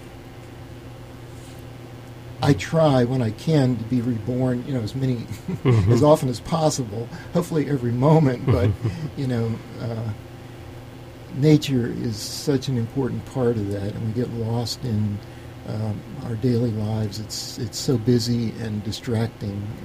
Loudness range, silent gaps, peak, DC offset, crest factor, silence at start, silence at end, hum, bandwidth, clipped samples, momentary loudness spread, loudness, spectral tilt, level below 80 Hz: 5 LU; none; -4 dBFS; under 0.1%; 20 dB; 0 s; 0 s; none; 15.5 kHz; under 0.1%; 21 LU; -23 LUFS; -6.5 dB/octave; -46 dBFS